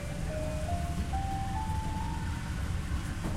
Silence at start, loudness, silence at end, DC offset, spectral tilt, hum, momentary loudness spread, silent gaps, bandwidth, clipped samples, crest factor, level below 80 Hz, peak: 0 s; -35 LUFS; 0 s; under 0.1%; -6 dB/octave; none; 2 LU; none; 15.5 kHz; under 0.1%; 12 dB; -38 dBFS; -22 dBFS